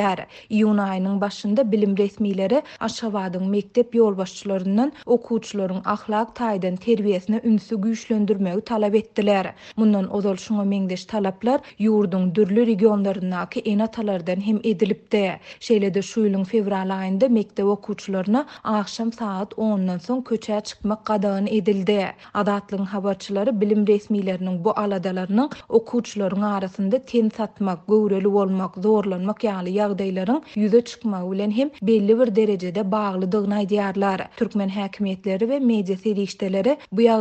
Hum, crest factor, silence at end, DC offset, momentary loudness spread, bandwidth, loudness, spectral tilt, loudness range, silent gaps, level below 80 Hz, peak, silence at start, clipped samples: none; 18 dB; 0 s; under 0.1%; 7 LU; 8.4 kHz; -22 LUFS; -7 dB/octave; 2 LU; none; -62 dBFS; -4 dBFS; 0 s; under 0.1%